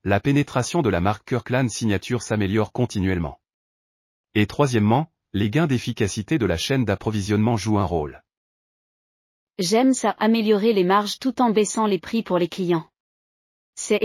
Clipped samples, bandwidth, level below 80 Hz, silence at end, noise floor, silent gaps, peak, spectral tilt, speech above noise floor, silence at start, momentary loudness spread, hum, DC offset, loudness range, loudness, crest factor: under 0.1%; 15 kHz; -48 dBFS; 0 s; under -90 dBFS; 3.54-4.24 s, 8.37-9.47 s, 13.00-13.73 s; -6 dBFS; -5.5 dB/octave; over 69 dB; 0.05 s; 7 LU; none; under 0.1%; 4 LU; -22 LUFS; 16 dB